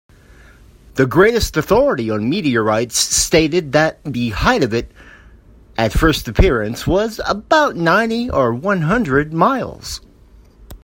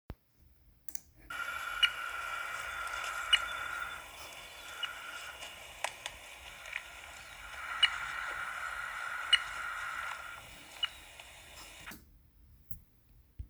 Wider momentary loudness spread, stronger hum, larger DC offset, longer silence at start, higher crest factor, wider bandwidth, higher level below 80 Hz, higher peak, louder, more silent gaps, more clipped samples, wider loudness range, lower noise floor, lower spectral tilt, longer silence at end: second, 9 LU vs 19 LU; neither; neither; first, 0.95 s vs 0.1 s; second, 16 dB vs 30 dB; second, 16.5 kHz vs over 20 kHz; first, -30 dBFS vs -62 dBFS; first, 0 dBFS vs -10 dBFS; first, -16 LUFS vs -36 LUFS; neither; neither; second, 3 LU vs 9 LU; second, -46 dBFS vs -65 dBFS; first, -4.5 dB/octave vs 0 dB/octave; about the same, 0.05 s vs 0 s